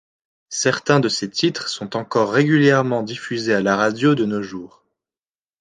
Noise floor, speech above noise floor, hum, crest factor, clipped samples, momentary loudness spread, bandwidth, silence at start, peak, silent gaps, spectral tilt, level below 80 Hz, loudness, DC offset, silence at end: under -90 dBFS; over 71 dB; none; 18 dB; under 0.1%; 11 LU; 9.8 kHz; 0.5 s; -2 dBFS; none; -5 dB/octave; -62 dBFS; -19 LUFS; under 0.1%; 0.95 s